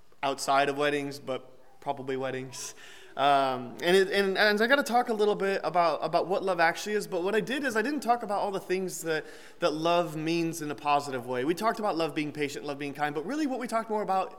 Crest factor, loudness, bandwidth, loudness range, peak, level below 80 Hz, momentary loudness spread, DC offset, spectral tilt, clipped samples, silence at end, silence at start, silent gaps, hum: 18 dB; -28 LUFS; 17.5 kHz; 5 LU; -10 dBFS; -70 dBFS; 11 LU; 0.3%; -4 dB/octave; under 0.1%; 0 s; 0.2 s; none; none